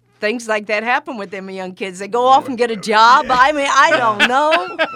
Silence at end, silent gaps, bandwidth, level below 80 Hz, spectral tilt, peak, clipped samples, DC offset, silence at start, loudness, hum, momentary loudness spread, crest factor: 0 s; none; 15.5 kHz; -54 dBFS; -2.5 dB/octave; 0 dBFS; under 0.1%; under 0.1%; 0.2 s; -14 LUFS; none; 16 LU; 16 dB